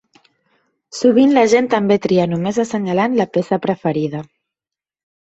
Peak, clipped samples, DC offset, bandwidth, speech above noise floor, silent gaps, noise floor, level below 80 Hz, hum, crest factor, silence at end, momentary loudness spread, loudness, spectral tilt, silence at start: -2 dBFS; under 0.1%; under 0.1%; 8.2 kHz; 73 dB; none; -88 dBFS; -58 dBFS; none; 16 dB; 1.05 s; 9 LU; -16 LUFS; -6 dB/octave; 0.95 s